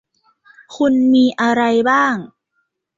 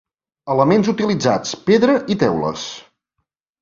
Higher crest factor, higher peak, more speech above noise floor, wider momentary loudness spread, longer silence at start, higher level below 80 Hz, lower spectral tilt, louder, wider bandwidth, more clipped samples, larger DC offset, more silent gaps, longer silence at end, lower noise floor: about the same, 14 dB vs 16 dB; about the same, -2 dBFS vs -2 dBFS; second, 55 dB vs 59 dB; second, 6 LU vs 15 LU; first, 0.7 s vs 0.45 s; second, -60 dBFS vs -54 dBFS; about the same, -5 dB/octave vs -5.5 dB/octave; about the same, -15 LUFS vs -17 LUFS; about the same, 7.6 kHz vs 7.6 kHz; neither; neither; neither; about the same, 0.7 s vs 0.8 s; second, -70 dBFS vs -75 dBFS